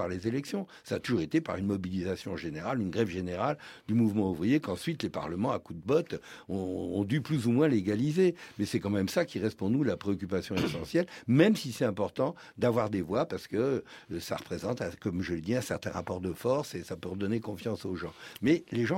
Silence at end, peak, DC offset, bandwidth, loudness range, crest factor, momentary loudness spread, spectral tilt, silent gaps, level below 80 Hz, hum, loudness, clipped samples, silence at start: 0 s; -10 dBFS; under 0.1%; 16.5 kHz; 4 LU; 20 dB; 9 LU; -6.5 dB/octave; none; -62 dBFS; none; -31 LUFS; under 0.1%; 0 s